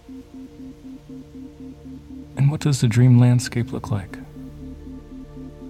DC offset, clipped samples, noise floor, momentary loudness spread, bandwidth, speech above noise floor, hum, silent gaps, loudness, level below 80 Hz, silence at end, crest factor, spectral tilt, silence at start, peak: under 0.1%; under 0.1%; -37 dBFS; 25 LU; 12.5 kHz; 17 dB; none; none; -19 LUFS; -46 dBFS; 0 s; 18 dB; -7 dB/octave; 0.1 s; -6 dBFS